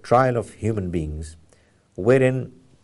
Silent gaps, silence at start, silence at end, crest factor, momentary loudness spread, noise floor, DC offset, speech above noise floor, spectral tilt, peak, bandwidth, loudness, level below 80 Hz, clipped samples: none; 0.05 s; 0.35 s; 18 dB; 20 LU; -57 dBFS; under 0.1%; 37 dB; -7.5 dB/octave; -4 dBFS; 11.5 kHz; -22 LUFS; -42 dBFS; under 0.1%